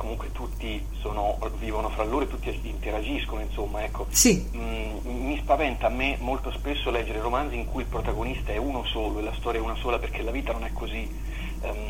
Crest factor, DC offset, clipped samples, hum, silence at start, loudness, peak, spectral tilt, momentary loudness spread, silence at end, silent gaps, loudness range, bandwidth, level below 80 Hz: 22 dB; under 0.1%; under 0.1%; none; 0 s; -28 LUFS; -6 dBFS; -4 dB/octave; 9 LU; 0 s; none; 5 LU; 17 kHz; -32 dBFS